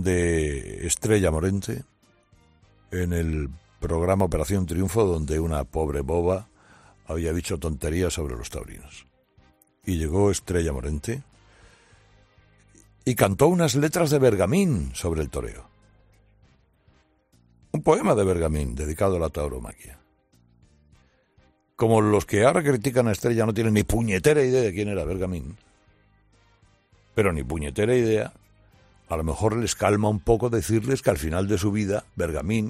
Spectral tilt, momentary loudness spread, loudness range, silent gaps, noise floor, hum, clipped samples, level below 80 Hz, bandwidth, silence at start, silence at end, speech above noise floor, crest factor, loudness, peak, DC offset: -6 dB/octave; 12 LU; 7 LU; none; -62 dBFS; none; under 0.1%; -40 dBFS; 15.5 kHz; 0 s; 0 s; 39 dB; 20 dB; -24 LUFS; -4 dBFS; under 0.1%